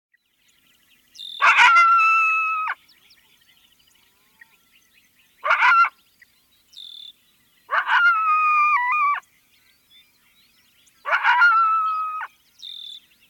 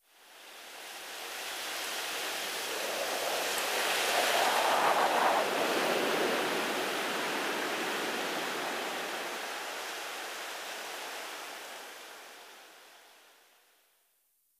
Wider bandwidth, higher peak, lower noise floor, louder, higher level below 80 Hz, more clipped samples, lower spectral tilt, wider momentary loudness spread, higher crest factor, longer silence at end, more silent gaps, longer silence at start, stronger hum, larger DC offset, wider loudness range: first, 17.5 kHz vs 15.5 kHz; first, -4 dBFS vs -14 dBFS; second, -63 dBFS vs -73 dBFS; first, -17 LUFS vs -32 LUFS; first, -74 dBFS vs -80 dBFS; neither; second, 2 dB/octave vs -1 dB/octave; first, 24 LU vs 18 LU; about the same, 18 dB vs 20 dB; second, 0.3 s vs 1.5 s; neither; first, 1.2 s vs 0.2 s; neither; neither; second, 5 LU vs 14 LU